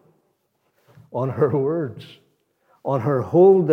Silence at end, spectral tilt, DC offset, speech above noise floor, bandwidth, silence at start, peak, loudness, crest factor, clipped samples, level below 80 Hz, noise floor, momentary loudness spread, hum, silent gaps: 0 s; -10 dB/octave; under 0.1%; 51 dB; 4.7 kHz; 1.15 s; -4 dBFS; -20 LUFS; 16 dB; under 0.1%; -74 dBFS; -69 dBFS; 18 LU; none; none